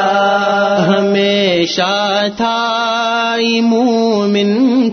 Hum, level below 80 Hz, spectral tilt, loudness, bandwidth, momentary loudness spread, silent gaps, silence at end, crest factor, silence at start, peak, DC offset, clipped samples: none; -56 dBFS; -5 dB/octave; -13 LUFS; 6.6 kHz; 3 LU; none; 0 s; 12 dB; 0 s; 0 dBFS; under 0.1%; under 0.1%